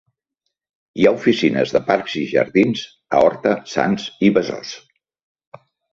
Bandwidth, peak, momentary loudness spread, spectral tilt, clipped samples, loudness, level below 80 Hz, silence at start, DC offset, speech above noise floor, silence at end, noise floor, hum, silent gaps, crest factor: 7.6 kHz; -2 dBFS; 12 LU; -6 dB/octave; under 0.1%; -18 LUFS; -56 dBFS; 0.95 s; under 0.1%; 60 dB; 1.15 s; -78 dBFS; none; none; 18 dB